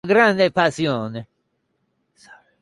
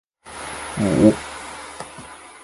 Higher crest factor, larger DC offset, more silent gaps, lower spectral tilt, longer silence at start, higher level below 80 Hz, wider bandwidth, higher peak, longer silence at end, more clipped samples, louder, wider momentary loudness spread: about the same, 18 dB vs 22 dB; neither; neither; about the same, -5.5 dB/octave vs -6 dB/octave; second, 0.05 s vs 0.25 s; second, -62 dBFS vs -46 dBFS; about the same, 11.5 kHz vs 11.5 kHz; second, -4 dBFS vs 0 dBFS; first, 0.3 s vs 0 s; neither; about the same, -18 LUFS vs -20 LUFS; second, 16 LU vs 23 LU